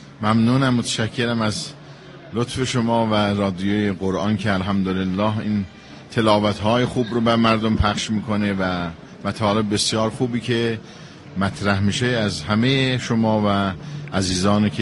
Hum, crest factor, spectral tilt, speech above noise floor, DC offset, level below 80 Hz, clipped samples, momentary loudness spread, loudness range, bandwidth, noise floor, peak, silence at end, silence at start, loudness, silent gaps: none; 18 dB; -5.5 dB/octave; 20 dB; under 0.1%; -42 dBFS; under 0.1%; 11 LU; 2 LU; 11.5 kHz; -40 dBFS; -2 dBFS; 0 s; 0 s; -20 LUFS; none